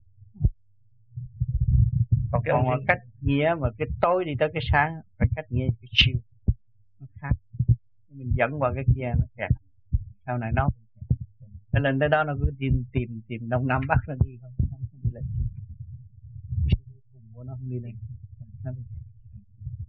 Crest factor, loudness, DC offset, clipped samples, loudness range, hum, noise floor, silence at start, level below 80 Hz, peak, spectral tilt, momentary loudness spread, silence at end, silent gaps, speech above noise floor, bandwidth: 22 dB; -26 LUFS; 0.2%; under 0.1%; 9 LU; none; -65 dBFS; 0.2 s; -34 dBFS; -4 dBFS; -5 dB/octave; 18 LU; 0.05 s; none; 40 dB; 4.8 kHz